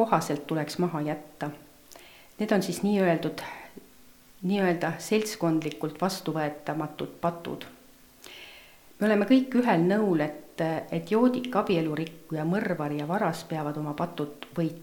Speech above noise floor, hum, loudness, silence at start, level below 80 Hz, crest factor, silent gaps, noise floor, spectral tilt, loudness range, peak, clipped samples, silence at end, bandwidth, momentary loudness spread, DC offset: 27 dB; none; -28 LUFS; 0 s; -66 dBFS; 20 dB; none; -54 dBFS; -6 dB/octave; 5 LU; -8 dBFS; under 0.1%; 0 s; 19 kHz; 15 LU; under 0.1%